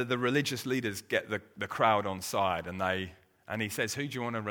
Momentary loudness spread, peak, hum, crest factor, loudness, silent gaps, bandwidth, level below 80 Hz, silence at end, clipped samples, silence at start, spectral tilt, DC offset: 9 LU; -10 dBFS; none; 22 dB; -32 LUFS; none; over 20 kHz; -66 dBFS; 0 s; under 0.1%; 0 s; -4.5 dB/octave; under 0.1%